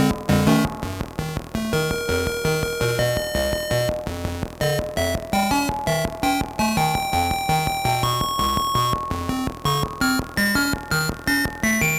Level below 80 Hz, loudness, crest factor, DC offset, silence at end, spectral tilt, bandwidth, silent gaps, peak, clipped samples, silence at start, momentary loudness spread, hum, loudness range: -36 dBFS; -22 LUFS; 18 dB; under 0.1%; 0 s; -4.5 dB/octave; 19 kHz; none; -4 dBFS; under 0.1%; 0 s; 6 LU; none; 2 LU